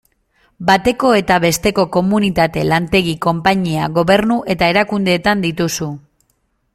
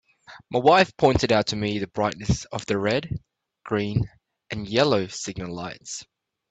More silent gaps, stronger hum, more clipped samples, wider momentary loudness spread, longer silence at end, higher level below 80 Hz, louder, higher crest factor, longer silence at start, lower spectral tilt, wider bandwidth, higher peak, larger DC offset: neither; neither; neither; second, 5 LU vs 17 LU; first, 0.75 s vs 0.45 s; about the same, -42 dBFS vs -46 dBFS; first, -15 LUFS vs -24 LUFS; about the same, 16 dB vs 20 dB; first, 0.6 s vs 0.3 s; about the same, -5 dB/octave vs -5 dB/octave; first, 16 kHz vs 9.2 kHz; first, 0 dBFS vs -4 dBFS; neither